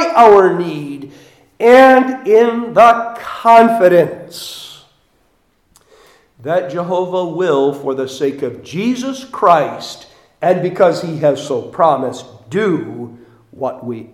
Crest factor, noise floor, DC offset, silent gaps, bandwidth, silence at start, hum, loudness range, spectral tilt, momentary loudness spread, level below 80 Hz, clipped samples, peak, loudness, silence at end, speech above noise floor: 14 dB; -58 dBFS; under 0.1%; none; 15 kHz; 0 s; none; 9 LU; -5.5 dB/octave; 20 LU; -58 dBFS; 0.2%; 0 dBFS; -13 LUFS; 0.1 s; 46 dB